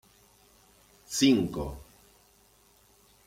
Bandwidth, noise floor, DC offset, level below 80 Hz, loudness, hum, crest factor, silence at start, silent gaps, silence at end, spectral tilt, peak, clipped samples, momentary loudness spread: 16 kHz; -62 dBFS; under 0.1%; -52 dBFS; -27 LUFS; none; 22 dB; 1.1 s; none; 1.45 s; -4 dB/octave; -12 dBFS; under 0.1%; 17 LU